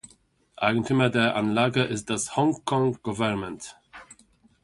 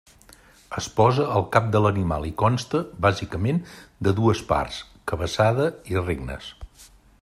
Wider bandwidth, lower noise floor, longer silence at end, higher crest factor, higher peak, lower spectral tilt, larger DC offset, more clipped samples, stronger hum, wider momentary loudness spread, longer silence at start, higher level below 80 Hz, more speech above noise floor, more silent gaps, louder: second, 11.5 kHz vs 13.5 kHz; first, -61 dBFS vs -52 dBFS; first, 0.5 s vs 0.35 s; about the same, 20 dB vs 20 dB; about the same, -6 dBFS vs -4 dBFS; second, -5 dB/octave vs -6.5 dB/octave; neither; neither; neither; second, 8 LU vs 12 LU; second, 0.05 s vs 0.7 s; second, -58 dBFS vs -44 dBFS; first, 36 dB vs 29 dB; neither; about the same, -25 LUFS vs -23 LUFS